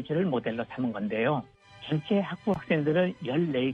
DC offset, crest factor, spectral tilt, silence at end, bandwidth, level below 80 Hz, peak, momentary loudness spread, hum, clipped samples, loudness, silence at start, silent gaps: under 0.1%; 16 dB; -8.5 dB/octave; 0 s; 7.2 kHz; -64 dBFS; -12 dBFS; 7 LU; none; under 0.1%; -29 LUFS; 0 s; none